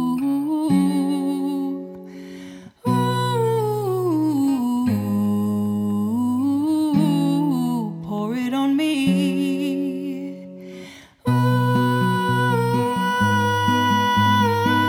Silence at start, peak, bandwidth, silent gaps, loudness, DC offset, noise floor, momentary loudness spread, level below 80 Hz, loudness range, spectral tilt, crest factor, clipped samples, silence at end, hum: 0 s; -6 dBFS; 18 kHz; none; -21 LUFS; under 0.1%; -41 dBFS; 14 LU; -58 dBFS; 4 LU; -6.5 dB/octave; 14 dB; under 0.1%; 0 s; none